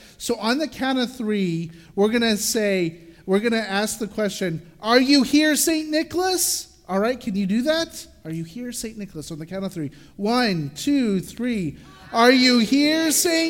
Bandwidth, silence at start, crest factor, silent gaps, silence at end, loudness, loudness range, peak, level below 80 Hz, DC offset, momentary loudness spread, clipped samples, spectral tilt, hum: 17 kHz; 0.2 s; 18 dB; none; 0 s; -21 LUFS; 6 LU; -2 dBFS; -54 dBFS; under 0.1%; 15 LU; under 0.1%; -3.5 dB/octave; none